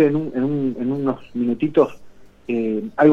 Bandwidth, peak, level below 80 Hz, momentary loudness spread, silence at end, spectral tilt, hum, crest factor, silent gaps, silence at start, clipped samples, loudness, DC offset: 6.6 kHz; -2 dBFS; -56 dBFS; 6 LU; 0 s; -9 dB/octave; 50 Hz at -55 dBFS; 18 dB; none; 0 s; under 0.1%; -21 LUFS; under 0.1%